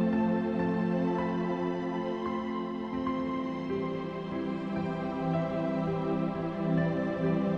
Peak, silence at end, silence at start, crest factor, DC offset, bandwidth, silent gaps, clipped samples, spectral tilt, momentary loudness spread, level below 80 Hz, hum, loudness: -16 dBFS; 0 s; 0 s; 14 dB; under 0.1%; 6.6 kHz; none; under 0.1%; -9 dB/octave; 5 LU; -56 dBFS; none; -32 LUFS